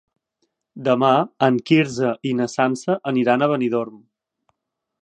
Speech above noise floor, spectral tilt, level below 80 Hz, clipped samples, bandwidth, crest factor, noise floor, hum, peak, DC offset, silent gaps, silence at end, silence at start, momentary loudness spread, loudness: 59 dB; -6 dB/octave; -68 dBFS; under 0.1%; 10 kHz; 20 dB; -78 dBFS; none; -2 dBFS; under 0.1%; none; 1.05 s; 0.75 s; 7 LU; -20 LUFS